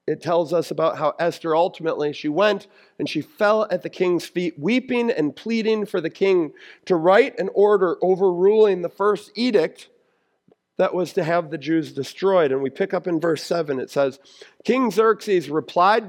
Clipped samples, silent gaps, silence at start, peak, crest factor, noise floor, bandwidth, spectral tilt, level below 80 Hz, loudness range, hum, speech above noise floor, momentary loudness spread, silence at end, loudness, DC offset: under 0.1%; none; 0.05 s; -2 dBFS; 18 dB; -67 dBFS; 16 kHz; -6 dB/octave; -76 dBFS; 4 LU; none; 46 dB; 8 LU; 0 s; -21 LUFS; under 0.1%